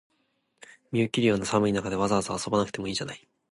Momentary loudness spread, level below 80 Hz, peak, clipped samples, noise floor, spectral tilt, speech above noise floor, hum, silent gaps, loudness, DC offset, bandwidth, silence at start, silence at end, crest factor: 8 LU; -56 dBFS; -8 dBFS; under 0.1%; -73 dBFS; -5 dB/octave; 47 dB; none; none; -27 LUFS; under 0.1%; 11.5 kHz; 0.9 s; 0.35 s; 20 dB